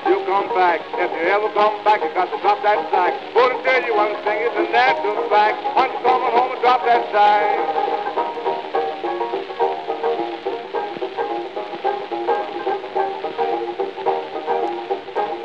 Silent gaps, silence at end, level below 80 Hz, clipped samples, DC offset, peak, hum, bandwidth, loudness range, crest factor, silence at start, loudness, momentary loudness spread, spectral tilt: none; 0 s; -78 dBFS; under 0.1%; 0.2%; -2 dBFS; none; 7.4 kHz; 7 LU; 18 dB; 0 s; -20 LUFS; 9 LU; -4.5 dB/octave